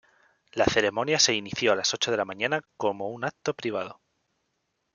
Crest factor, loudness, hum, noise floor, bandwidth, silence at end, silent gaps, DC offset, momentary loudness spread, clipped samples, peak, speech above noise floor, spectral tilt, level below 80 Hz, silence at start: 22 dB; -26 LUFS; none; -77 dBFS; 11 kHz; 1 s; none; under 0.1%; 10 LU; under 0.1%; -6 dBFS; 51 dB; -2.5 dB/octave; -58 dBFS; 0.55 s